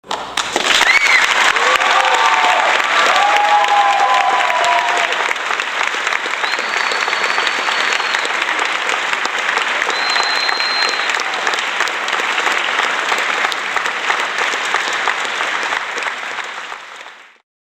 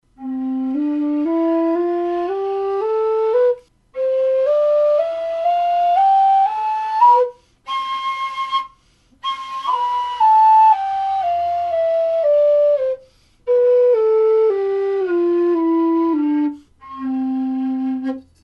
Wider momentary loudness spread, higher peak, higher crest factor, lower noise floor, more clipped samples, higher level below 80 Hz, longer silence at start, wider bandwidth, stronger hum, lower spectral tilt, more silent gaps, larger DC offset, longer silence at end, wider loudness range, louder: second, 7 LU vs 11 LU; about the same, 0 dBFS vs -2 dBFS; about the same, 16 dB vs 14 dB; second, -37 dBFS vs -55 dBFS; neither; about the same, -60 dBFS vs -60 dBFS; second, 0.05 s vs 0.2 s; first, 17 kHz vs 7.6 kHz; neither; second, 0.5 dB/octave vs -5.5 dB/octave; neither; neither; first, 0.5 s vs 0.25 s; about the same, 5 LU vs 4 LU; first, -14 LUFS vs -17 LUFS